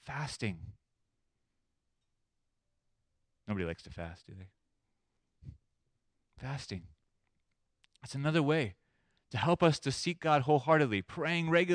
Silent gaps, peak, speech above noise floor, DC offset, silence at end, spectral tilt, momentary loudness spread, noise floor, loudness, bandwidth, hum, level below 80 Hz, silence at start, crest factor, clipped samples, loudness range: none; -14 dBFS; 50 dB; under 0.1%; 0 s; -6 dB/octave; 18 LU; -82 dBFS; -32 LUFS; 10.5 kHz; none; -64 dBFS; 0.05 s; 22 dB; under 0.1%; 18 LU